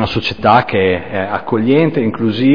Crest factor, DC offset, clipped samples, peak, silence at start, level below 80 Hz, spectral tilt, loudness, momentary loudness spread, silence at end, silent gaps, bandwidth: 14 dB; 2%; under 0.1%; 0 dBFS; 0 s; -44 dBFS; -8 dB/octave; -14 LUFS; 7 LU; 0 s; none; 5.4 kHz